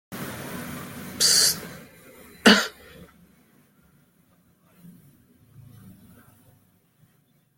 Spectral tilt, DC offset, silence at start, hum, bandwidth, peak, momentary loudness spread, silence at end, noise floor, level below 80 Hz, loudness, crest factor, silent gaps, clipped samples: -1.5 dB/octave; under 0.1%; 0.1 s; none; 17 kHz; -2 dBFS; 21 LU; 1.65 s; -64 dBFS; -64 dBFS; -20 LUFS; 26 dB; none; under 0.1%